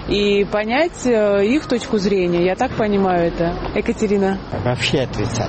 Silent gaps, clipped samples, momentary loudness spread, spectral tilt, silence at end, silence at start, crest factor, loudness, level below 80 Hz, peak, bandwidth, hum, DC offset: none; under 0.1%; 5 LU; -5.5 dB/octave; 0 s; 0 s; 12 dB; -18 LUFS; -36 dBFS; -4 dBFS; 8.8 kHz; none; under 0.1%